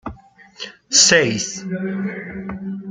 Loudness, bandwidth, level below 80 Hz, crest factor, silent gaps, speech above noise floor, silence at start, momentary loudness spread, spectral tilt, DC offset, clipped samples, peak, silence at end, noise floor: -16 LUFS; 10.5 kHz; -52 dBFS; 20 dB; none; 25 dB; 0.05 s; 23 LU; -2 dB/octave; under 0.1%; under 0.1%; 0 dBFS; 0 s; -44 dBFS